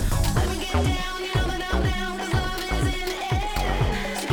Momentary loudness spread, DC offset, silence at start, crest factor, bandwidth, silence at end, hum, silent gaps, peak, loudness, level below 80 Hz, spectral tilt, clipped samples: 3 LU; under 0.1%; 0 s; 14 dB; 19 kHz; 0 s; none; none; -10 dBFS; -25 LUFS; -28 dBFS; -5 dB/octave; under 0.1%